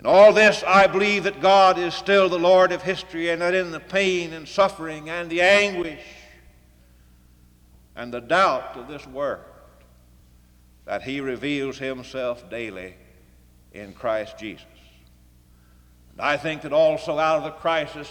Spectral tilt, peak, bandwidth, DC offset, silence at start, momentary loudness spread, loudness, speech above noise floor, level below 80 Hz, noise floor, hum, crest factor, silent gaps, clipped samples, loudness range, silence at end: -4 dB/octave; -4 dBFS; 12 kHz; under 0.1%; 0.05 s; 18 LU; -21 LUFS; 33 dB; -54 dBFS; -54 dBFS; none; 18 dB; none; under 0.1%; 13 LU; 0 s